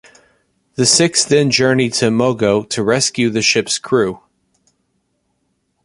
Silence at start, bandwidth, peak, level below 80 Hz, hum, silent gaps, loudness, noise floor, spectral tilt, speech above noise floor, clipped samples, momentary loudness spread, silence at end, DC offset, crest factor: 0.8 s; 11.5 kHz; 0 dBFS; -54 dBFS; none; none; -14 LUFS; -67 dBFS; -3.5 dB/octave; 52 dB; under 0.1%; 6 LU; 1.7 s; under 0.1%; 16 dB